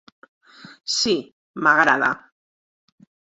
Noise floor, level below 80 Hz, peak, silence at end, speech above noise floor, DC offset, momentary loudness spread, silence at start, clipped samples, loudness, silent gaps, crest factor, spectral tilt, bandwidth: under -90 dBFS; -62 dBFS; -2 dBFS; 1.1 s; over 71 dB; under 0.1%; 18 LU; 0.85 s; under 0.1%; -19 LUFS; 1.32-1.54 s; 22 dB; -2 dB/octave; 8.4 kHz